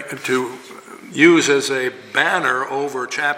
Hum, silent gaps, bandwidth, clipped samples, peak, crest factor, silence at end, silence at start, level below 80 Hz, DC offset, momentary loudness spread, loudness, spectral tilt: none; none; 16 kHz; under 0.1%; 0 dBFS; 18 dB; 0 s; 0 s; -70 dBFS; under 0.1%; 18 LU; -17 LUFS; -3.5 dB/octave